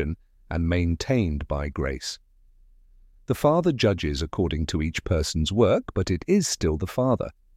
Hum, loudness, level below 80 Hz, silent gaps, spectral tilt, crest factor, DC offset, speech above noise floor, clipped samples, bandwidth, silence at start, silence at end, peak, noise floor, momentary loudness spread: none; -25 LUFS; -36 dBFS; none; -5.5 dB/octave; 18 dB; under 0.1%; 31 dB; under 0.1%; 16 kHz; 0 s; 0.25 s; -8 dBFS; -55 dBFS; 9 LU